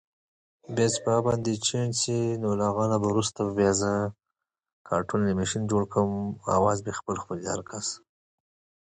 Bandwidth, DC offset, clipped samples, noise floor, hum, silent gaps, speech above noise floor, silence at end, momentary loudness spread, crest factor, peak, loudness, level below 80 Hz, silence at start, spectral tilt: 10 kHz; under 0.1%; under 0.1%; -86 dBFS; none; 4.73-4.85 s; 60 dB; 0.85 s; 9 LU; 18 dB; -10 dBFS; -27 LUFS; -54 dBFS; 0.7 s; -5 dB/octave